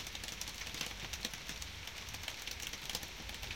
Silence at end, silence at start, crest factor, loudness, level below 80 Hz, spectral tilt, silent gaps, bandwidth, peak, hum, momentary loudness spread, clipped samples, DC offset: 0 s; 0 s; 24 dB; -42 LUFS; -54 dBFS; -1.5 dB/octave; none; 17 kHz; -20 dBFS; none; 3 LU; under 0.1%; under 0.1%